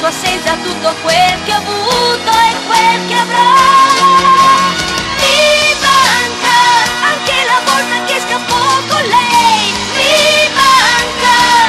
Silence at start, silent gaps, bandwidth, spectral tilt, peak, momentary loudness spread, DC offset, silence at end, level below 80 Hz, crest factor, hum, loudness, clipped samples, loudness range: 0 s; none; 15 kHz; -1.5 dB/octave; 0 dBFS; 7 LU; under 0.1%; 0 s; -40 dBFS; 10 dB; none; -9 LUFS; under 0.1%; 3 LU